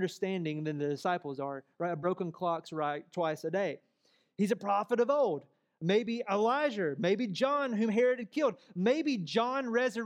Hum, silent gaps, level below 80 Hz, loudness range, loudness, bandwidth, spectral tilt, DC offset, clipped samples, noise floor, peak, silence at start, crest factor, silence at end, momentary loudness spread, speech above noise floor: none; none; -88 dBFS; 4 LU; -32 LUFS; 14.5 kHz; -6 dB/octave; under 0.1%; under 0.1%; -72 dBFS; -16 dBFS; 0 s; 16 dB; 0 s; 8 LU; 41 dB